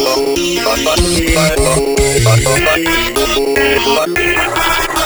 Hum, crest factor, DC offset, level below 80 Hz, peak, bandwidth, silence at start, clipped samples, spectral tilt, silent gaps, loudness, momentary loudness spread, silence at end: none; 12 dB; under 0.1%; -24 dBFS; 0 dBFS; over 20 kHz; 0 s; under 0.1%; -3.5 dB/octave; none; -12 LUFS; 3 LU; 0 s